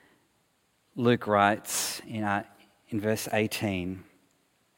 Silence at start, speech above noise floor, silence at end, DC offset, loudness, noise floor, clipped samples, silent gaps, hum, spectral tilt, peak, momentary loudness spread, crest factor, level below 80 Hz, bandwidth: 0.95 s; 43 dB; 0.75 s; under 0.1%; -28 LUFS; -71 dBFS; under 0.1%; none; none; -4.5 dB/octave; -6 dBFS; 14 LU; 24 dB; -68 dBFS; 17 kHz